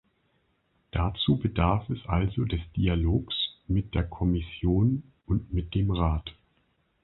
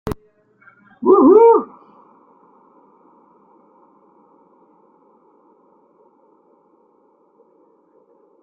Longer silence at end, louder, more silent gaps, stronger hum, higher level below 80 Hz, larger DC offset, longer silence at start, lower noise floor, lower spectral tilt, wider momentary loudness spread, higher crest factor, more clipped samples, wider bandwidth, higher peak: second, 0.7 s vs 6.8 s; second, -28 LUFS vs -12 LUFS; neither; neither; first, -36 dBFS vs -52 dBFS; neither; first, 0.95 s vs 0.05 s; first, -71 dBFS vs -57 dBFS; first, -11 dB/octave vs -9.5 dB/octave; second, 6 LU vs 24 LU; about the same, 20 dB vs 20 dB; neither; about the same, 4.2 kHz vs 4.4 kHz; second, -8 dBFS vs -2 dBFS